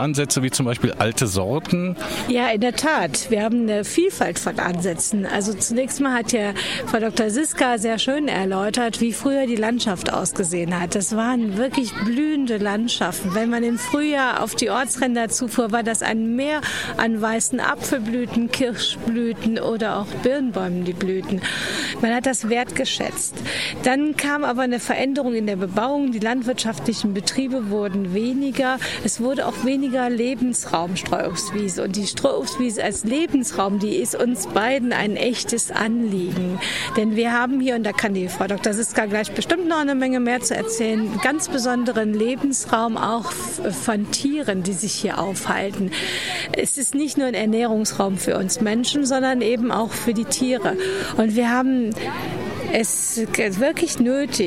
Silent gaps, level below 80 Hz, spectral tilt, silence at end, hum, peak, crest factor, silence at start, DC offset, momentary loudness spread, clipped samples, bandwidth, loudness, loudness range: none; -54 dBFS; -3.5 dB/octave; 0 s; none; -2 dBFS; 20 dB; 0 s; 0.3%; 4 LU; under 0.1%; 16 kHz; -21 LUFS; 2 LU